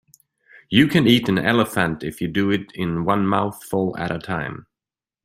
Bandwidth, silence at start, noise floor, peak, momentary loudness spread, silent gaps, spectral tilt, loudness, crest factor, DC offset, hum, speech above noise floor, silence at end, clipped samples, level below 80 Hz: 16 kHz; 0.7 s; under -90 dBFS; -2 dBFS; 11 LU; none; -6 dB/octave; -20 LUFS; 20 dB; under 0.1%; none; over 70 dB; 0.65 s; under 0.1%; -52 dBFS